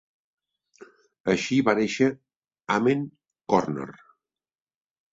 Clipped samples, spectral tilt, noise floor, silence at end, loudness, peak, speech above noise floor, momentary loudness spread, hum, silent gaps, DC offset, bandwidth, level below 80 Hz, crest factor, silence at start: under 0.1%; -5.5 dB/octave; under -90 dBFS; 1.2 s; -25 LUFS; -4 dBFS; over 66 dB; 19 LU; none; 1.20-1.24 s, 2.36-2.41 s; under 0.1%; 7.8 kHz; -64 dBFS; 24 dB; 0.8 s